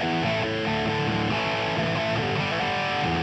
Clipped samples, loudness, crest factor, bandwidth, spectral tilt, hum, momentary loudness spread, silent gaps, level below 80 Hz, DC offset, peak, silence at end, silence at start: under 0.1%; -25 LUFS; 12 dB; 8.8 kHz; -5.5 dB/octave; none; 1 LU; none; -50 dBFS; under 0.1%; -14 dBFS; 0 s; 0 s